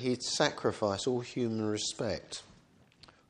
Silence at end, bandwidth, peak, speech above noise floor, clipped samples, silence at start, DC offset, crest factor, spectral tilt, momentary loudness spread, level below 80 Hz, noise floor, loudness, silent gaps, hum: 0.85 s; 11 kHz; -10 dBFS; 30 dB; under 0.1%; 0 s; under 0.1%; 24 dB; -4 dB/octave; 9 LU; -66 dBFS; -63 dBFS; -33 LUFS; none; none